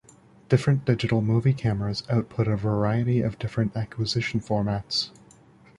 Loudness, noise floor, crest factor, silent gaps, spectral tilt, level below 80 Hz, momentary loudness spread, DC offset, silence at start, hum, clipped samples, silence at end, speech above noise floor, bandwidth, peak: -25 LUFS; -54 dBFS; 20 dB; none; -7 dB/octave; -50 dBFS; 5 LU; under 0.1%; 0.5 s; none; under 0.1%; 0.7 s; 30 dB; 11 kHz; -6 dBFS